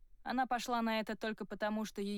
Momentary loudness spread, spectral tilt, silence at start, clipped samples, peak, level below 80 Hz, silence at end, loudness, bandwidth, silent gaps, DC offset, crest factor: 5 LU; -4.5 dB/octave; 0.2 s; under 0.1%; -26 dBFS; -62 dBFS; 0 s; -38 LUFS; 19 kHz; none; under 0.1%; 12 dB